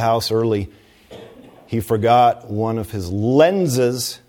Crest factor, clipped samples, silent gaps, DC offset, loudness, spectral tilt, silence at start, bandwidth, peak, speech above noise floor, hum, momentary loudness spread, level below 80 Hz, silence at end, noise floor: 18 dB; under 0.1%; none; under 0.1%; -18 LUFS; -5.5 dB/octave; 0 s; 18 kHz; -2 dBFS; 24 dB; none; 11 LU; -48 dBFS; 0.1 s; -42 dBFS